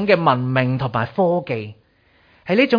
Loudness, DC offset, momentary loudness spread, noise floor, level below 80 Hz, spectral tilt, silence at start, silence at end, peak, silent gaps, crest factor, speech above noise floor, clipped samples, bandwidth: -19 LUFS; under 0.1%; 12 LU; -57 dBFS; -56 dBFS; -8.5 dB/octave; 0 s; 0 s; -2 dBFS; none; 18 dB; 39 dB; under 0.1%; 5.2 kHz